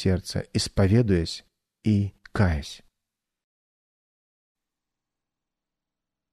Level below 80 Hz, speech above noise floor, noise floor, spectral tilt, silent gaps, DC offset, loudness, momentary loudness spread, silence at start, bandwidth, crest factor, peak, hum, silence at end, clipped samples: -44 dBFS; 64 dB; -87 dBFS; -6.5 dB/octave; none; under 0.1%; -25 LUFS; 14 LU; 0 s; 13.5 kHz; 20 dB; -8 dBFS; none; 3.55 s; under 0.1%